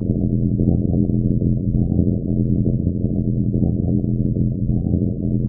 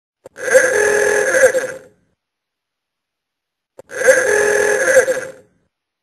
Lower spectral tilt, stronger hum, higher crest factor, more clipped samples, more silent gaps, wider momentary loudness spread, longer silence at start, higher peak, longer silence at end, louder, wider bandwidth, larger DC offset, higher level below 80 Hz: first, -14 dB/octave vs -1.5 dB/octave; neither; about the same, 16 dB vs 18 dB; neither; neither; second, 2 LU vs 14 LU; second, 0 s vs 0.35 s; about the same, -2 dBFS vs 0 dBFS; second, 0 s vs 0.7 s; second, -20 LUFS vs -14 LUFS; second, 0.8 kHz vs 13 kHz; neither; first, -28 dBFS vs -56 dBFS